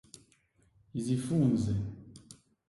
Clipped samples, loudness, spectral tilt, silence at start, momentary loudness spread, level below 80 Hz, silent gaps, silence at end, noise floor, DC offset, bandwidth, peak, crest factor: under 0.1%; -32 LUFS; -7.5 dB/octave; 0.95 s; 23 LU; -56 dBFS; none; 0.35 s; -69 dBFS; under 0.1%; 11.5 kHz; -16 dBFS; 18 dB